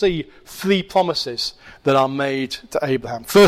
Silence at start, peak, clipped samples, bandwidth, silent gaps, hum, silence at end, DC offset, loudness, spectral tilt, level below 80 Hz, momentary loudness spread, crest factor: 0 s; -6 dBFS; under 0.1%; 16 kHz; none; none; 0 s; under 0.1%; -21 LUFS; -5 dB/octave; -50 dBFS; 9 LU; 14 dB